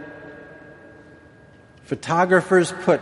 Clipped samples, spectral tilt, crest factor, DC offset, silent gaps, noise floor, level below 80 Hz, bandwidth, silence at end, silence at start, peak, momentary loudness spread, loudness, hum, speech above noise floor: under 0.1%; -5.5 dB/octave; 20 dB; under 0.1%; none; -49 dBFS; -62 dBFS; 11.5 kHz; 0 s; 0 s; -4 dBFS; 25 LU; -19 LUFS; none; 30 dB